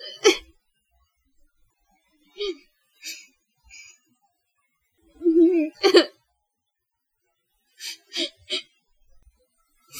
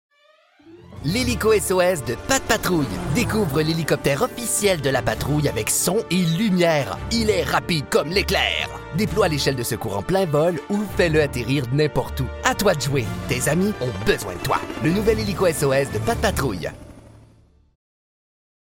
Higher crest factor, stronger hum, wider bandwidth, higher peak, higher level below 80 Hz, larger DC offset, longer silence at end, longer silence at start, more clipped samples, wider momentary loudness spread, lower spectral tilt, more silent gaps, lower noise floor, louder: first, 26 dB vs 18 dB; neither; second, 15 kHz vs 17 kHz; about the same, -2 dBFS vs -4 dBFS; second, -64 dBFS vs -38 dBFS; neither; second, 0 s vs 1.7 s; second, 0 s vs 0.65 s; neither; first, 23 LU vs 6 LU; second, -1.5 dB/octave vs -4.5 dB/octave; neither; first, -78 dBFS vs -57 dBFS; about the same, -22 LUFS vs -21 LUFS